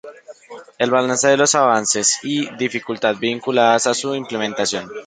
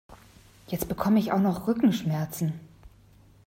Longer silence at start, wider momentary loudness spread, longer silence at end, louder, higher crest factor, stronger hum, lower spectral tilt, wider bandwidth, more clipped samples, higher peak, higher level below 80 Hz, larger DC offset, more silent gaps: about the same, 0.05 s vs 0.1 s; about the same, 9 LU vs 10 LU; second, 0 s vs 0.6 s; first, -17 LUFS vs -27 LUFS; about the same, 18 dB vs 16 dB; neither; second, -2.5 dB/octave vs -7 dB/octave; second, 9.6 kHz vs 16 kHz; neither; first, 0 dBFS vs -12 dBFS; second, -64 dBFS vs -54 dBFS; neither; neither